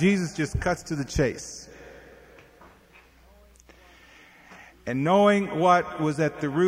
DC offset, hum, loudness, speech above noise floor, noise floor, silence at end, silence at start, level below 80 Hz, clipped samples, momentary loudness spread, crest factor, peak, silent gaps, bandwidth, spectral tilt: under 0.1%; none; -24 LUFS; 31 dB; -55 dBFS; 0 s; 0 s; -44 dBFS; under 0.1%; 20 LU; 20 dB; -6 dBFS; none; 15.5 kHz; -6 dB/octave